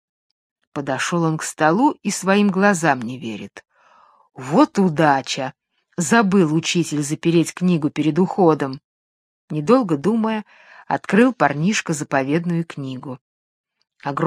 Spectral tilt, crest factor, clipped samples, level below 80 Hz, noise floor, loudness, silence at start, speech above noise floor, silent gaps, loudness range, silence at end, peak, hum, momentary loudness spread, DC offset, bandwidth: -5.5 dB/octave; 20 dB; under 0.1%; -66 dBFS; -53 dBFS; -19 LUFS; 0.75 s; 35 dB; 8.84-9.48 s, 13.21-13.64 s; 3 LU; 0 s; 0 dBFS; none; 14 LU; under 0.1%; 14.5 kHz